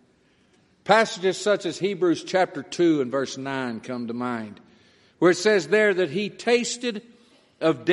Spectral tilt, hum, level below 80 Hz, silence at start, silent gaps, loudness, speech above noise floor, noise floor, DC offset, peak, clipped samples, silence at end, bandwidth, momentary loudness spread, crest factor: -4.5 dB/octave; none; -72 dBFS; 0.85 s; none; -23 LUFS; 39 dB; -61 dBFS; under 0.1%; -2 dBFS; under 0.1%; 0 s; 11.5 kHz; 11 LU; 22 dB